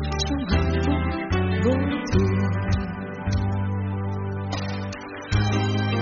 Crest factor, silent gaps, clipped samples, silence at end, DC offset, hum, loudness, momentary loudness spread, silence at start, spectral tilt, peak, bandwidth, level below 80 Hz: 16 dB; none; under 0.1%; 0 s; under 0.1%; none; -25 LUFS; 7 LU; 0 s; -6 dB/octave; -8 dBFS; 7.2 kHz; -34 dBFS